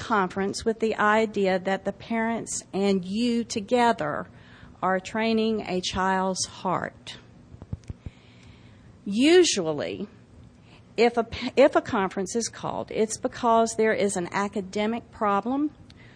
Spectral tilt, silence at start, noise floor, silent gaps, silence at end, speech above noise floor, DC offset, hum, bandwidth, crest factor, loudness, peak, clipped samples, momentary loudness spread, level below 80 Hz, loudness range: -4 dB/octave; 0 s; -51 dBFS; none; 0.05 s; 27 dB; under 0.1%; none; 10.5 kHz; 18 dB; -25 LUFS; -8 dBFS; under 0.1%; 15 LU; -54 dBFS; 4 LU